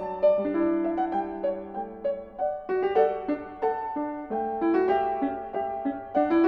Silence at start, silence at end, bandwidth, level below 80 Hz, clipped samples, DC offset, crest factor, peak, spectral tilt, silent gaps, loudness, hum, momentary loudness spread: 0 s; 0 s; 5.2 kHz; -58 dBFS; under 0.1%; under 0.1%; 16 dB; -10 dBFS; -8.5 dB/octave; none; -27 LUFS; none; 8 LU